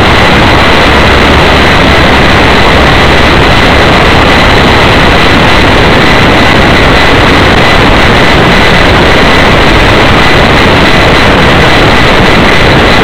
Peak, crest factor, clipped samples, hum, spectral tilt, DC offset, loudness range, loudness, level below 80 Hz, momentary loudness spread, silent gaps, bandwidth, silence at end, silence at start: 0 dBFS; 4 dB; 20%; none; -5 dB/octave; 10%; 0 LU; -3 LUFS; -12 dBFS; 0 LU; none; over 20 kHz; 0 s; 0 s